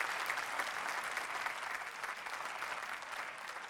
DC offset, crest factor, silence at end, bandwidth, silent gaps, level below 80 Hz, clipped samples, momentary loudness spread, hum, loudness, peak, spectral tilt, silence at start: under 0.1%; 22 dB; 0 s; 18 kHz; none; -78 dBFS; under 0.1%; 5 LU; none; -40 LUFS; -18 dBFS; 0 dB/octave; 0 s